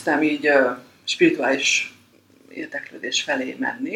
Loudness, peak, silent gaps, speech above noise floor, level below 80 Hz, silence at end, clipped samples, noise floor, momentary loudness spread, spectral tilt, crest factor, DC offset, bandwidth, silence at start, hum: -21 LUFS; -4 dBFS; none; 33 dB; -74 dBFS; 0 s; under 0.1%; -54 dBFS; 14 LU; -2.5 dB/octave; 18 dB; under 0.1%; 13.5 kHz; 0 s; none